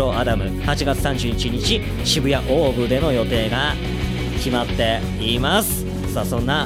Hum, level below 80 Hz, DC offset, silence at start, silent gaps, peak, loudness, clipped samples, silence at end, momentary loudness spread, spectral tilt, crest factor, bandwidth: none; -28 dBFS; under 0.1%; 0 s; none; -4 dBFS; -20 LUFS; under 0.1%; 0 s; 6 LU; -5 dB/octave; 14 dB; 16 kHz